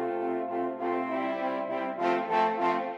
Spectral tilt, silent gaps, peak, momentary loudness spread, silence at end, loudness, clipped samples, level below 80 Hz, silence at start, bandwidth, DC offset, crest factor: -6.5 dB/octave; none; -14 dBFS; 5 LU; 0 s; -30 LUFS; under 0.1%; -84 dBFS; 0 s; 7.8 kHz; under 0.1%; 14 dB